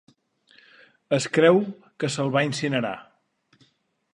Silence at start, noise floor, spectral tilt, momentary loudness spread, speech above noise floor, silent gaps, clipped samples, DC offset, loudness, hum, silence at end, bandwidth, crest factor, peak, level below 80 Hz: 1.1 s; -65 dBFS; -5 dB/octave; 14 LU; 43 dB; none; under 0.1%; under 0.1%; -23 LUFS; none; 1.1 s; 11.5 kHz; 20 dB; -4 dBFS; -72 dBFS